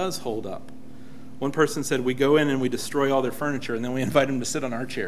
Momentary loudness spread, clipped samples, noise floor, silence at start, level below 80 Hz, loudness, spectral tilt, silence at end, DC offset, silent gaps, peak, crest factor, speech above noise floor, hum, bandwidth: 12 LU; under 0.1%; -45 dBFS; 0 s; -58 dBFS; -25 LUFS; -5 dB/octave; 0 s; 2%; none; -4 dBFS; 22 dB; 20 dB; none; 16 kHz